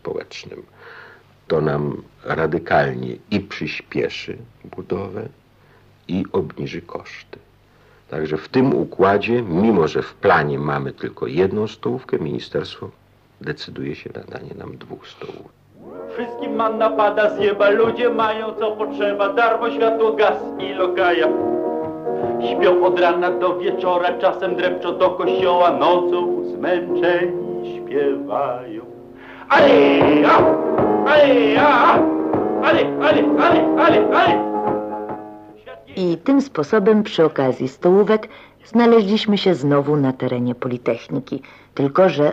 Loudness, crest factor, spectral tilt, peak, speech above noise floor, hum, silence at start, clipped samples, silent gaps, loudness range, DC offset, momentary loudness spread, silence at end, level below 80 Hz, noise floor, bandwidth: -18 LUFS; 16 dB; -7 dB/octave; -2 dBFS; 34 dB; none; 0.05 s; under 0.1%; none; 13 LU; under 0.1%; 19 LU; 0 s; -54 dBFS; -52 dBFS; 7.8 kHz